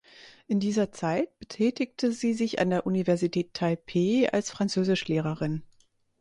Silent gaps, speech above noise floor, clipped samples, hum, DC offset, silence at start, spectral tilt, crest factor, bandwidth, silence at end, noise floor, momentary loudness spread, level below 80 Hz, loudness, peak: none; 38 dB; under 0.1%; none; under 0.1%; 0.2 s; -6 dB/octave; 16 dB; 11 kHz; 0.55 s; -65 dBFS; 5 LU; -62 dBFS; -28 LUFS; -12 dBFS